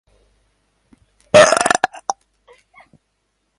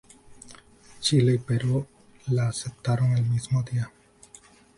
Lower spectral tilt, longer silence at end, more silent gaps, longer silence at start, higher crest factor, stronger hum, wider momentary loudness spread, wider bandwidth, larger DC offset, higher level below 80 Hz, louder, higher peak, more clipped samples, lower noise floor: second, -2.5 dB/octave vs -6 dB/octave; first, 1.45 s vs 0.9 s; neither; first, 1.35 s vs 0.3 s; about the same, 20 dB vs 18 dB; neither; first, 17 LU vs 10 LU; about the same, 11.5 kHz vs 11.5 kHz; neither; about the same, -56 dBFS vs -56 dBFS; first, -14 LUFS vs -25 LUFS; first, 0 dBFS vs -10 dBFS; neither; first, -69 dBFS vs -53 dBFS